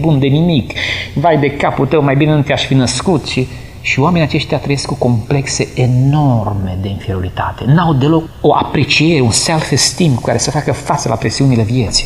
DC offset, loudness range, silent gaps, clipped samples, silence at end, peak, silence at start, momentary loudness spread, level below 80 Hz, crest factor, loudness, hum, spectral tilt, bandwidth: 0.6%; 2 LU; none; under 0.1%; 0 s; 0 dBFS; 0 s; 7 LU; -34 dBFS; 12 dB; -13 LUFS; none; -5 dB/octave; 13 kHz